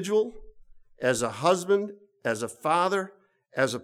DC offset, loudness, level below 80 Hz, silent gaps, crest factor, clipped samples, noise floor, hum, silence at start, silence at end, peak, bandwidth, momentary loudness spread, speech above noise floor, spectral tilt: under 0.1%; -27 LUFS; -58 dBFS; none; 18 dB; under 0.1%; -51 dBFS; none; 0 s; 0 s; -10 dBFS; 15 kHz; 10 LU; 25 dB; -4 dB/octave